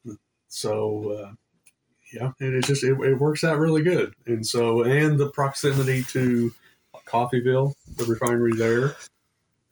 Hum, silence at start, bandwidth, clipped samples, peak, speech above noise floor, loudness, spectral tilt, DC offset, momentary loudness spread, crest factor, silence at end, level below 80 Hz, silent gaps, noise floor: none; 0.05 s; over 20 kHz; under 0.1%; -8 dBFS; 50 dB; -23 LUFS; -6 dB/octave; under 0.1%; 12 LU; 16 dB; 0.65 s; -60 dBFS; none; -73 dBFS